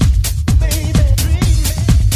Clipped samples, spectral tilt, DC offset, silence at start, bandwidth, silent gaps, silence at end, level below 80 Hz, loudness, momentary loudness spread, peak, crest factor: under 0.1%; -5 dB/octave; under 0.1%; 0 s; 16 kHz; none; 0 s; -14 dBFS; -14 LUFS; 1 LU; 0 dBFS; 12 dB